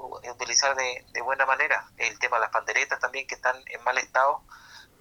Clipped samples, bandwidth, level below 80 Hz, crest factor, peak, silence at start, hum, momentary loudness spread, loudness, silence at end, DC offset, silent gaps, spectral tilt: under 0.1%; 19.5 kHz; -64 dBFS; 20 dB; -8 dBFS; 0 s; none; 8 LU; -25 LUFS; 0.2 s; under 0.1%; none; 1 dB/octave